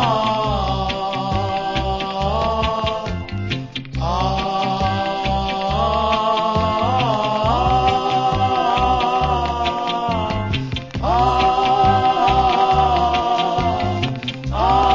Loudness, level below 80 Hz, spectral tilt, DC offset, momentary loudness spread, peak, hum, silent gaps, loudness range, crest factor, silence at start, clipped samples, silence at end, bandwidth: -19 LUFS; -30 dBFS; -6 dB/octave; 0.1%; 8 LU; -4 dBFS; none; none; 5 LU; 14 dB; 0 s; under 0.1%; 0 s; 7.6 kHz